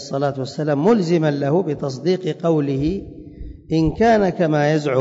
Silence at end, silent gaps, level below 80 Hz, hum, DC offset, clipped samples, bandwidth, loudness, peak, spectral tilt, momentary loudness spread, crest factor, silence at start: 0 s; none; -42 dBFS; none; under 0.1%; under 0.1%; 7.8 kHz; -19 LUFS; -6 dBFS; -7.5 dB/octave; 11 LU; 12 dB; 0 s